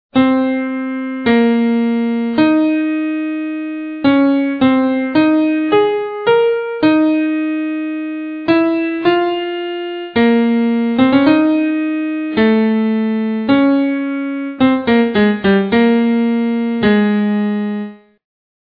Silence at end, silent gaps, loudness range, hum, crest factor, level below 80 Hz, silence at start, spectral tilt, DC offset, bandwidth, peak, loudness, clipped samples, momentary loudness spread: 0.65 s; none; 2 LU; none; 14 dB; -52 dBFS; 0.15 s; -9.5 dB/octave; under 0.1%; 5 kHz; 0 dBFS; -15 LUFS; under 0.1%; 9 LU